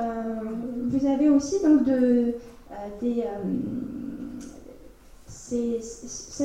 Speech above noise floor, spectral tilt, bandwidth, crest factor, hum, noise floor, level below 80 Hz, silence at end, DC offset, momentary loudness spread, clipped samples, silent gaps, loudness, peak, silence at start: 24 dB; -6 dB/octave; 10 kHz; 16 dB; none; -48 dBFS; -52 dBFS; 0 s; under 0.1%; 18 LU; under 0.1%; none; -25 LUFS; -8 dBFS; 0 s